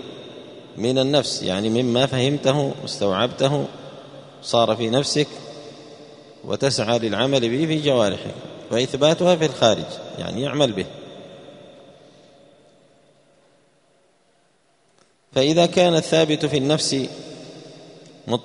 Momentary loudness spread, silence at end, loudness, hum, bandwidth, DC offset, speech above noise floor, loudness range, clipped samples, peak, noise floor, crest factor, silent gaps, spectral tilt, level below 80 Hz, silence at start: 22 LU; 0 s; -20 LUFS; none; 11 kHz; under 0.1%; 42 dB; 7 LU; under 0.1%; 0 dBFS; -62 dBFS; 22 dB; none; -5 dB/octave; -58 dBFS; 0 s